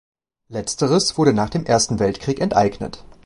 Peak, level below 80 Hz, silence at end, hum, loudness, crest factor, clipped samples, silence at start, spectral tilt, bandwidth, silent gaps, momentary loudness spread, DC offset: -2 dBFS; -44 dBFS; 0.1 s; none; -19 LUFS; 18 dB; under 0.1%; 0.5 s; -4.5 dB/octave; 11.5 kHz; none; 13 LU; under 0.1%